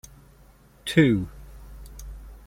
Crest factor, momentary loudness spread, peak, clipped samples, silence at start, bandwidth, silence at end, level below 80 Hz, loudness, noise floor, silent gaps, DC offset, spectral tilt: 22 dB; 26 LU; -6 dBFS; under 0.1%; 0.85 s; 16.5 kHz; 0.1 s; -44 dBFS; -22 LUFS; -54 dBFS; none; under 0.1%; -6.5 dB/octave